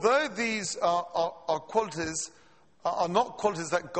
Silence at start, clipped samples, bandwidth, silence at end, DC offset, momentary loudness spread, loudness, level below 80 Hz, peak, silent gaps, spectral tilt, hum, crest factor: 0 s; under 0.1%; 8.8 kHz; 0 s; under 0.1%; 6 LU; -29 LUFS; -64 dBFS; -10 dBFS; none; -3 dB/octave; none; 20 dB